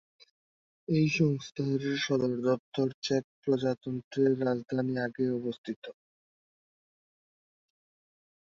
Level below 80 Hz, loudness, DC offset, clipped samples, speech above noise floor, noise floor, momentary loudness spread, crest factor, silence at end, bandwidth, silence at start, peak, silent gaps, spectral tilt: -72 dBFS; -30 LUFS; under 0.1%; under 0.1%; over 60 dB; under -90 dBFS; 9 LU; 18 dB; 2.55 s; 7.6 kHz; 0.9 s; -14 dBFS; 2.59-2.72 s, 2.94-3.02 s, 3.24-3.43 s, 4.04-4.11 s, 5.58-5.64 s, 5.76-5.82 s; -6.5 dB/octave